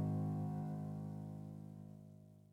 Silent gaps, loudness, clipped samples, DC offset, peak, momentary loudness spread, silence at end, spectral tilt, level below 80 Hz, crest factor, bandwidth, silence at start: none; -45 LUFS; under 0.1%; under 0.1%; -30 dBFS; 18 LU; 0.1 s; -10 dB/octave; -74 dBFS; 14 dB; 2.8 kHz; 0 s